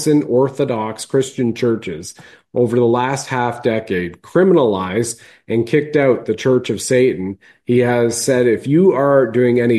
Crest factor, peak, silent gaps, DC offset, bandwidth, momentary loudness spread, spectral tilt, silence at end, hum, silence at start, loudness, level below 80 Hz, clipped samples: 14 dB; -2 dBFS; none; under 0.1%; 12.5 kHz; 9 LU; -6 dB/octave; 0 s; none; 0 s; -16 LUFS; -56 dBFS; under 0.1%